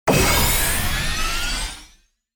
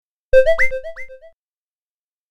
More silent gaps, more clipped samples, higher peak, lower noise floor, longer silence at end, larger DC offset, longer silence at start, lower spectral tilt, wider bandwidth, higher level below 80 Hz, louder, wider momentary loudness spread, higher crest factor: neither; neither; second, -4 dBFS vs 0 dBFS; second, -55 dBFS vs under -90 dBFS; second, 0.5 s vs 1.05 s; neither; second, 0.05 s vs 0.35 s; about the same, -3 dB/octave vs -3.5 dB/octave; first, over 20 kHz vs 10.5 kHz; first, -26 dBFS vs -34 dBFS; second, -19 LUFS vs -16 LUFS; second, 12 LU vs 22 LU; about the same, 16 dB vs 18 dB